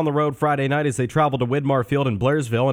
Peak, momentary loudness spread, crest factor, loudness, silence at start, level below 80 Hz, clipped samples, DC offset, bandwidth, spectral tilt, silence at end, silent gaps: -6 dBFS; 2 LU; 14 dB; -21 LUFS; 0 s; -52 dBFS; under 0.1%; under 0.1%; 15.5 kHz; -7 dB/octave; 0 s; none